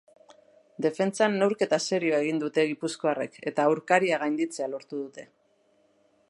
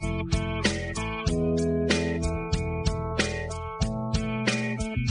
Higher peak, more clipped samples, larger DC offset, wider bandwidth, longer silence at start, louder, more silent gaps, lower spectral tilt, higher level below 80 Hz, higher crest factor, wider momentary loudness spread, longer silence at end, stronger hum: about the same, -6 dBFS vs -8 dBFS; neither; neither; first, 11.5 kHz vs 10 kHz; first, 0.8 s vs 0 s; about the same, -27 LUFS vs -28 LUFS; neither; about the same, -4.5 dB/octave vs -5 dB/octave; second, -82 dBFS vs -36 dBFS; about the same, 22 dB vs 20 dB; first, 11 LU vs 5 LU; first, 1.05 s vs 0 s; neither